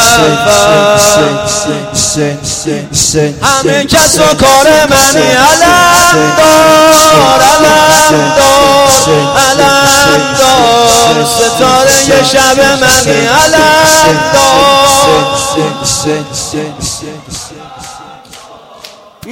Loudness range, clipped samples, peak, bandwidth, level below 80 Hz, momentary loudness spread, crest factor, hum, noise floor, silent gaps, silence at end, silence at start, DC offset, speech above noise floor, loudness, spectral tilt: 6 LU; 2%; 0 dBFS; over 20 kHz; -32 dBFS; 11 LU; 6 dB; none; -32 dBFS; none; 0 s; 0 s; under 0.1%; 26 dB; -5 LUFS; -2.5 dB/octave